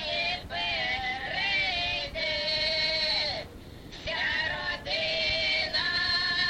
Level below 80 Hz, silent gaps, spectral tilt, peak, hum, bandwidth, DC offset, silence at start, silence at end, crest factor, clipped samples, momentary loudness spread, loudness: -50 dBFS; none; -2.5 dB/octave; -16 dBFS; none; 16.5 kHz; under 0.1%; 0 s; 0 s; 14 dB; under 0.1%; 7 LU; -27 LUFS